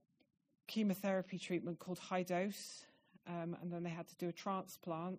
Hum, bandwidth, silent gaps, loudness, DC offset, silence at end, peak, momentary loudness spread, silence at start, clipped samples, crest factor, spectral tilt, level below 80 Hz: none; 15.5 kHz; none; -43 LUFS; under 0.1%; 0 s; -26 dBFS; 11 LU; 0.7 s; under 0.1%; 18 dB; -5.5 dB/octave; -86 dBFS